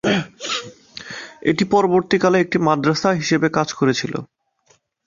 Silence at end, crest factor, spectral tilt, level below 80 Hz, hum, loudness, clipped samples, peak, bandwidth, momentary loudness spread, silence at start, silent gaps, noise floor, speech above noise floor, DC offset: 0.8 s; 18 dB; -5 dB/octave; -56 dBFS; none; -18 LUFS; under 0.1%; -2 dBFS; 7.4 kHz; 16 LU; 0.05 s; none; -60 dBFS; 42 dB; under 0.1%